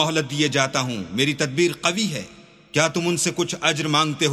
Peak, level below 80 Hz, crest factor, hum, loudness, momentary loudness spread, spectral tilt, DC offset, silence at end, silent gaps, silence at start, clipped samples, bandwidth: -2 dBFS; -60 dBFS; 20 dB; none; -21 LUFS; 6 LU; -3.5 dB/octave; under 0.1%; 0 s; none; 0 s; under 0.1%; 15 kHz